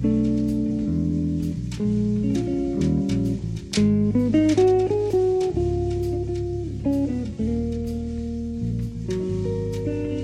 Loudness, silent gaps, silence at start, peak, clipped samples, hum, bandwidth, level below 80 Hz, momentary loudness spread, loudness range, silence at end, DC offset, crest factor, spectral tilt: -24 LUFS; none; 0 s; -8 dBFS; under 0.1%; none; 11.5 kHz; -36 dBFS; 9 LU; 6 LU; 0 s; under 0.1%; 14 dB; -8 dB/octave